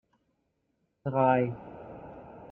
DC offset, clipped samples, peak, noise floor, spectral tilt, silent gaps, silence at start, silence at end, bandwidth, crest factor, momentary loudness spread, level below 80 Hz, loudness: under 0.1%; under 0.1%; -12 dBFS; -77 dBFS; -11 dB/octave; none; 1.05 s; 0.05 s; 3.9 kHz; 22 dB; 22 LU; -64 dBFS; -28 LUFS